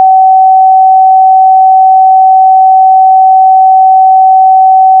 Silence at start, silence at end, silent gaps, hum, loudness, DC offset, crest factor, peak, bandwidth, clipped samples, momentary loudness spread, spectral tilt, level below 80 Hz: 0 s; 0 s; none; none; -3 LUFS; under 0.1%; 4 dB; 0 dBFS; 0.9 kHz; under 0.1%; 0 LU; 4.5 dB/octave; under -90 dBFS